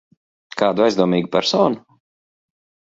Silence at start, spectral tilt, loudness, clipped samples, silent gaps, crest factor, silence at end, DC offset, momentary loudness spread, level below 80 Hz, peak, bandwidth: 0.55 s; -5.5 dB/octave; -18 LUFS; under 0.1%; none; 18 dB; 1.1 s; under 0.1%; 10 LU; -60 dBFS; -2 dBFS; 7.8 kHz